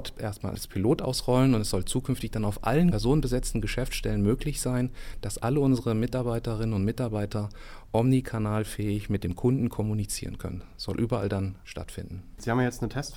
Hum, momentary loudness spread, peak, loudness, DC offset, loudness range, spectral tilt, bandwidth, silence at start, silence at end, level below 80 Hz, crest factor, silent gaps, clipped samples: none; 12 LU; -10 dBFS; -28 LUFS; under 0.1%; 4 LU; -6 dB/octave; 17 kHz; 0 s; 0 s; -40 dBFS; 16 dB; none; under 0.1%